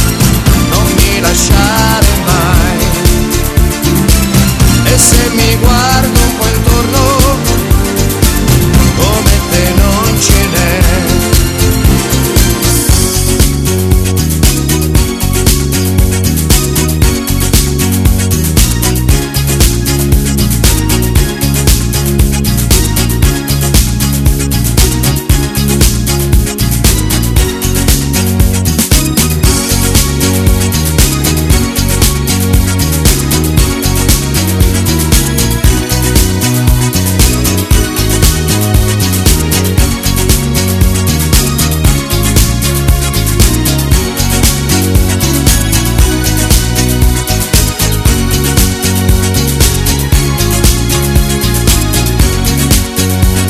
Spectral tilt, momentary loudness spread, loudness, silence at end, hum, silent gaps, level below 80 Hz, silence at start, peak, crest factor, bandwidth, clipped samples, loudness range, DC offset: -4 dB/octave; 3 LU; -9 LUFS; 0 s; none; none; -14 dBFS; 0 s; 0 dBFS; 8 dB; over 20 kHz; 1%; 2 LU; under 0.1%